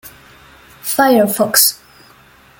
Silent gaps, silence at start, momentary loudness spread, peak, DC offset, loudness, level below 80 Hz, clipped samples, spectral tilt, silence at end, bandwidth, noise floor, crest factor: none; 0.05 s; 15 LU; 0 dBFS; under 0.1%; -12 LUFS; -56 dBFS; under 0.1%; -2 dB/octave; 0.85 s; 17 kHz; -46 dBFS; 18 dB